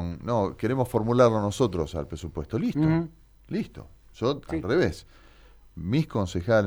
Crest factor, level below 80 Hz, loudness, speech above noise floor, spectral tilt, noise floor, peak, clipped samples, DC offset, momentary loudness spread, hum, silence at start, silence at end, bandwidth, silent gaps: 18 dB; -46 dBFS; -26 LUFS; 27 dB; -7 dB/octave; -53 dBFS; -8 dBFS; under 0.1%; under 0.1%; 13 LU; none; 0 s; 0 s; 19.5 kHz; none